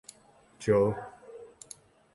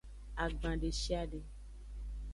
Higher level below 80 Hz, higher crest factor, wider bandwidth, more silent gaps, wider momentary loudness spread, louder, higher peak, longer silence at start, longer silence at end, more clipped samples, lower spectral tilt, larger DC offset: second, -60 dBFS vs -42 dBFS; about the same, 20 dB vs 18 dB; about the same, 11.5 kHz vs 11.5 kHz; neither; first, 24 LU vs 14 LU; first, -28 LUFS vs -40 LUFS; first, -12 dBFS vs -20 dBFS; first, 0.6 s vs 0.05 s; first, 0.7 s vs 0 s; neither; first, -6.5 dB/octave vs -5 dB/octave; neither